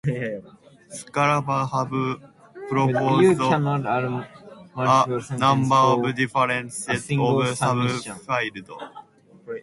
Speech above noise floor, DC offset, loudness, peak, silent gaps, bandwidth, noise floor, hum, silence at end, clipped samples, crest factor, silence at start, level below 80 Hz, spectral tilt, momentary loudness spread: 25 dB; under 0.1%; -22 LUFS; -4 dBFS; none; 11.5 kHz; -47 dBFS; none; 0 s; under 0.1%; 18 dB; 0.05 s; -60 dBFS; -5.5 dB/octave; 19 LU